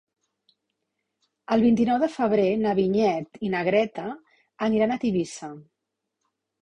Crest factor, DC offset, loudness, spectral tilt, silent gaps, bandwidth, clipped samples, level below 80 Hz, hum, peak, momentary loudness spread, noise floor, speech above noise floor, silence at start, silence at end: 16 dB; under 0.1%; -24 LUFS; -6.5 dB/octave; none; 10 kHz; under 0.1%; -62 dBFS; none; -8 dBFS; 14 LU; -82 dBFS; 59 dB; 1.5 s; 1 s